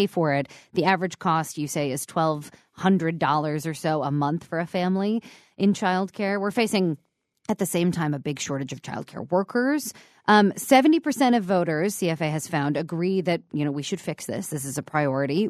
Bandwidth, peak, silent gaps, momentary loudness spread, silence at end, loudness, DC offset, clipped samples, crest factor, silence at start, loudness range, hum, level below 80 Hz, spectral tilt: 14 kHz; -4 dBFS; none; 10 LU; 0 s; -24 LUFS; under 0.1%; under 0.1%; 20 dB; 0 s; 5 LU; none; -68 dBFS; -5.5 dB/octave